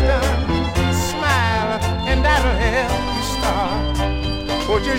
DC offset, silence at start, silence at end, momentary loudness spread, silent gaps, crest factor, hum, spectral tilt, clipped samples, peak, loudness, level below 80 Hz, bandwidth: under 0.1%; 0 s; 0 s; 5 LU; none; 14 dB; none; -5 dB/octave; under 0.1%; -4 dBFS; -19 LUFS; -24 dBFS; 16 kHz